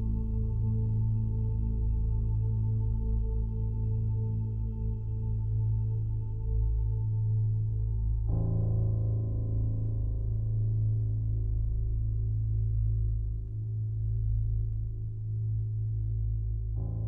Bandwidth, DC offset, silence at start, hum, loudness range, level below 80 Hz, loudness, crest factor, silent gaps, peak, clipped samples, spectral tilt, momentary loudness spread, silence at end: 1.1 kHz; under 0.1%; 0 s; none; 2 LU; -34 dBFS; -32 LUFS; 10 dB; none; -18 dBFS; under 0.1%; -13.5 dB/octave; 5 LU; 0 s